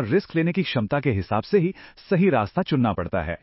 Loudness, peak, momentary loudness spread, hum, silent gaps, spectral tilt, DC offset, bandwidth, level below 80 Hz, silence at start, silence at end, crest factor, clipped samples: -23 LUFS; -8 dBFS; 6 LU; none; none; -11.5 dB/octave; under 0.1%; 5.8 kHz; -44 dBFS; 0 s; 0.05 s; 16 dB; under 0.1%